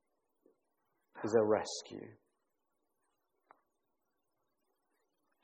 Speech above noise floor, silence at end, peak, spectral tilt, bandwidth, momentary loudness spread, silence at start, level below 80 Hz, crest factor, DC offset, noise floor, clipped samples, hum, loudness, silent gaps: 51 dB; 3.3 s; -16 dBFS; -4.5 dB/octave; 9.2 kHz; 20 LU; 1.15 s; -84 dBFS; 26 dB; under 0.1%; -85 dBFS; under 0.1%; none; -34 LUFS; none